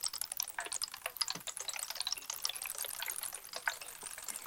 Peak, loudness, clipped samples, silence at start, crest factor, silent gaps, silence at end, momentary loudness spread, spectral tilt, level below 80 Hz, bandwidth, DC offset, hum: -14 dBFS; -38 LUFS; under 0.1%; 0 s; 26 dB; none; 0 s; 5 LU; 2 dB/octave; -72 dBFS; 17 kHz; under 0.1%; none